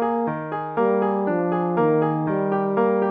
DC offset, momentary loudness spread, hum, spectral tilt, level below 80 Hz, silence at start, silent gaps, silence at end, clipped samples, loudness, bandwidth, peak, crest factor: under 0.1%; 5 LU; none; -11.5 dB/octave; -62 dBFS; 0 s; none; 0 s; under 0.1%; -22 LUFS; 4.5 kHz; -8 dBFS; 12 dB